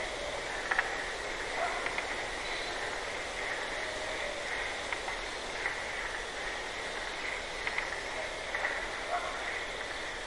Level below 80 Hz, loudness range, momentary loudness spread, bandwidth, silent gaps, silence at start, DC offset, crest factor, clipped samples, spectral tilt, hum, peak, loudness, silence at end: -52 dBFS; 1 LU; 4 LU; 11.5 kHz; none; 0 s; under 0.1%; 26 dB; under 0.1%; -1.5 dB/octave; none; -10 dBFS; -35 LUFS; 0 s